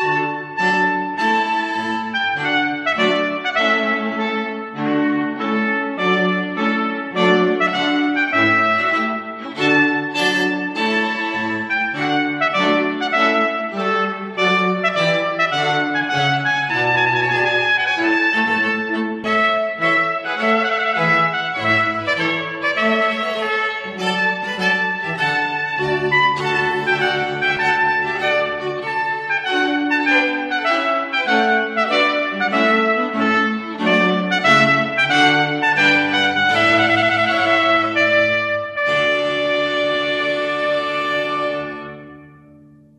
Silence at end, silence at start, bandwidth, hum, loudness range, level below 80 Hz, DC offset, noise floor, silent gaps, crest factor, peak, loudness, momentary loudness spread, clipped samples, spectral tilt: 0.7 s; 0 s; 12 kHz; none; 4 LU; -60 dBFS; under 0.1%; -46 dBFS; none; 18 dB; 0 dBFS; -17 LUFS; 6 LU; under 0.1%; -4.5 dB/octave